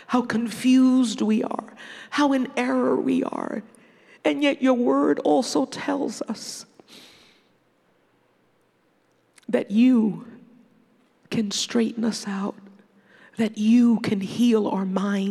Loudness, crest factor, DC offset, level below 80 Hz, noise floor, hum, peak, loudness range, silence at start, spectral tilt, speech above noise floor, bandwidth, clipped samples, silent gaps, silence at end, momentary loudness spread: -23 LUFS; 18 dB; under 0.1%; -74 dBFS; -65 dBFS; none; -6 dBFS; 9 LU; 0 s; -5 dB/octave; 43 dB; 12.5 kHz; under 0.1%; none; 0 s; 14 LU